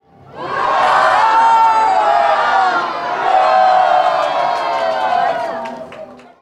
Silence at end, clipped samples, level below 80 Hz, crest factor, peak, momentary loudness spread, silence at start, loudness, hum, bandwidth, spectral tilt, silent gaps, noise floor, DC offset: 0.2 s; under 0.1%; -58 dBFS; 12 dB; -2 dBFS; 13 LU; 0.3 s; -13 LUFS; none; 11.5 kHz; -3 dB/octave; none; -34 dBFS; under 0.1%